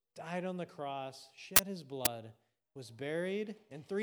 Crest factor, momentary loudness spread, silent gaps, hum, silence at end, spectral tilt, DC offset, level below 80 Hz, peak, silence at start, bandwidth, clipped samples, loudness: 34 dB; 22 LU; none; none; 0 s; -2.5 dB/octave; under 0.1%; -64 dBFS; -4 dBFS; 0.15 s; over 20 kHz; under 0.1%; -35 LUFS